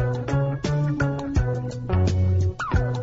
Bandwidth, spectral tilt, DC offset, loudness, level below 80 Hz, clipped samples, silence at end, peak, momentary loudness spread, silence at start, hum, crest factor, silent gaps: 7.8 kHz; -7.5 dB/octave; under 0.1%; -24 LUFS; -34 dBFS; under 0.1%; 0 s; -10 dBFS; 4 LU; 0 s; none; 14 dB; none